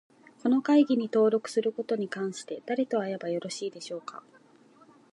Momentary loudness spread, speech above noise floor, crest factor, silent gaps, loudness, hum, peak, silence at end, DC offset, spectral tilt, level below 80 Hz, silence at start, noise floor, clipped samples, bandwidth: 16 LU; 31 dB; 18 dB; none; -28 LUFS; none; -12 dBFS; 0.95 s; under 0.1%; -5.5 dB/octave; -86 dBFS; 0.45 s; -58 dBFS; under 0.1%; 11.5 kHz